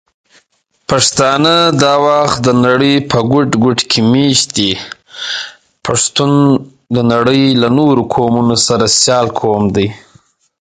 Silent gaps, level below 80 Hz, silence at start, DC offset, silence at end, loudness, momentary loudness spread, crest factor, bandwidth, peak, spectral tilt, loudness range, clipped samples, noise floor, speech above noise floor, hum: none; -44 dBFS; 0.9 s; under 0.1%; 0.65 s; -11 LUFS; 10 LU; 12 dB; 9.6 kHz; 0 dBFS; -4 dB/octave; 3 LU; under 0.1%; -57 dBFS; 46 dB; none